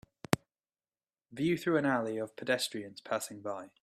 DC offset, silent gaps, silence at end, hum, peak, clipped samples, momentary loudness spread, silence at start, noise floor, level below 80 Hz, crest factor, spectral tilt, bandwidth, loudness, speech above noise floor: under 0.1%; none; 0.15 s; none; -4 dBFS; under 0.1%; 11 LU; 0.3 s; under -90 dBFS; -70 dBFS; 32 dB; -4.5 dB/octave; 15.5 kHz; -34 LUFS; over 56 dB